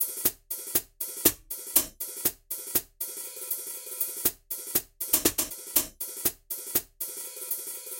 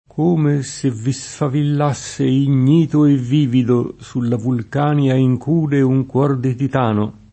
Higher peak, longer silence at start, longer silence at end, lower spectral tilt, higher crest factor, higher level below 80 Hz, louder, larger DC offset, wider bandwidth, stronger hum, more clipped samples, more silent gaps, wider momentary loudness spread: second, -4 dBFS vs 0 dBFS; second, 0 s vs 0.15 s; second, 0 s vs 0.2 s; second, -1 dB/octave vs -7.5 dB/octave; first, 28 dB vs 16 dB; second, -58 dBFS vs -52 dBFS; second, -28 LUFS vs -17 LUFS; neither; first, 17 kHz vs 8.8 kHz; neither; neither; neither; first, 11 LU vs 7 LU